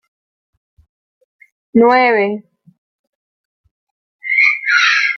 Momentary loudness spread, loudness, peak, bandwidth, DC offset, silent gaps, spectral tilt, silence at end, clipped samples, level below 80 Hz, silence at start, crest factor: 12 LU; -12 LUFS; 0 dBFS; 6.8 kHz; under 0.1%; 2.78-3.64 s, 3.71-4.19 s; -3.5 dB/octave; 0 s; under 0.1%; -66 dBFS; 1.75 s; 16 dB